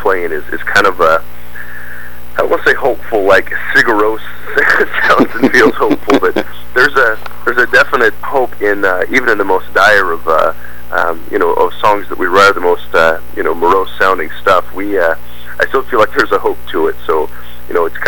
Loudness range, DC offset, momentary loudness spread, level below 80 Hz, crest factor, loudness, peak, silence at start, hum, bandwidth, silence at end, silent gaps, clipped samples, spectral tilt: 3 LU; 10%; 10 LU; -38 dBFS; 14 dB; -12 LUFS; 0 dBFS; 0 s; 60 Hz at -35 dBFS; 19.5 kHz; 0 s; none; under 0.1%; -4.5 dB/octave